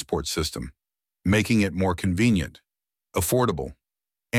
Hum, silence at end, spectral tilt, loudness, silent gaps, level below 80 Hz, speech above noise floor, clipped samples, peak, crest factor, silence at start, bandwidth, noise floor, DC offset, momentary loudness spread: none; 0 s; -5 dB/octave; -24 LUFS; none; -44 dBFS; over 67 dB; under 0.1%; -10 dBFS; 16 dB; 0 s; 17 kHz; under -90 dBFS; under 0.1%; 14 LU